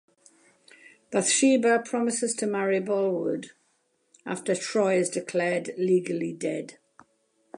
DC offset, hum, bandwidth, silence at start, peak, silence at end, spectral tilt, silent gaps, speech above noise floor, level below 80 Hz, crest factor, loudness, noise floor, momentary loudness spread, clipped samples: under 0.1%; none; 11.5 kHz; 1.1 s; -10 dBFS; 0.85 s; -4 dB/octave; none; 45 dB; -80 dBFS; 16 dB; -26 LUFS; -71 dBFS; 13 LU; under 0.1%